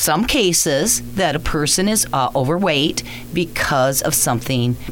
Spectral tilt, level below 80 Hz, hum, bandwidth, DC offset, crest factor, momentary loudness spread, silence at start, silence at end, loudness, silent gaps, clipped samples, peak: -3.5 dB/octave; -36 dBFS; none; over 20 kHz; under 0.1%; 14 dB; 5 LU; 0 s; 0 s; -17 LUFS; none; under 0.1%; -4 dBFS